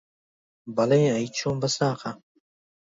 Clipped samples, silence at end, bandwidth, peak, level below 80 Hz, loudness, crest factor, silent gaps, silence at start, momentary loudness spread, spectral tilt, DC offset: under 0.1%; 0.75 s; 7.8 kHz; -10 dBFS; -62 dBFS; -25 LUFS; 18 dB; none; 0.65 s; 14 LU; -5.5 dB/octave; under 0.1%